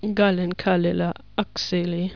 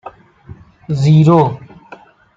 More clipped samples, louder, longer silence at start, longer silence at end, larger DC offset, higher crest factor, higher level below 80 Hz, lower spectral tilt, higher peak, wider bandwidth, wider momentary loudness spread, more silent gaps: neither; second, -23 LUFS vs -12 LUFS; about the same, 0 s vs 0.05 s; second, 0 s vs 0.8 s; first, 0.5% vs under 0.1%; about the same, 16 dB vs 14 dB; about the same, -52 dBFS vs -50 dBFS; second, -6.5 dB/octave vs -9 dB/octave; second, -6 dBFS vs -2 dBFS; second, 5.4 kHz vs 7.6 kHz; second, 6 LU vs 15 LU; neither